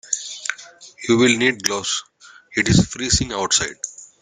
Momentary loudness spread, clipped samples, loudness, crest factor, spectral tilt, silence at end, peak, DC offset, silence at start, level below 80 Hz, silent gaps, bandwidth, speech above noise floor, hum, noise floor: 14 LU; under 0.1%; -19 LUFS; 20 dB; -3 dB/octave; 0.15 s; 0 dBFS; under 0.1%; 0.05 s; -40 dBFS; none; 13.5 kHz; 23 dB; none; -42 dBFS